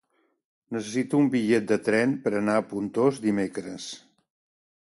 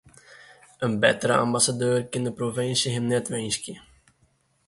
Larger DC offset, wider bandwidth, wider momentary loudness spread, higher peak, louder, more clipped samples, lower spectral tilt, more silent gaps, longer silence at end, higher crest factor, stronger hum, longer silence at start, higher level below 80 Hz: neither; about the same, 11.5 kHz vs 12 kHz; first, 13 LU vs 9 LU; second, -10 dBFS vs -4 dBFS; about the same, -25 LUFS vs -24 LUFS; neither; first, -6 dB/octave vs -3.5 dB/octave; neither; about the same, 0.9 s vs 0.9 s; second, 16 dB vs 22 dB; neither; first, 0.7 s vs 0.3 s; second, -68 dBFS vs -62 dBFS